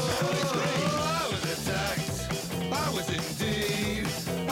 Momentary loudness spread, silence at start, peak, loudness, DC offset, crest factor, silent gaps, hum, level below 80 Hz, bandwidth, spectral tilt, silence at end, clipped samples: 4 LU; 0 s; -18 dBFS; -29 LUFS; under 0.1%; 12 dB; none; none; -48 dBFS; 16.5 kHz; -4 dB/octave; 0 s; under 0.1%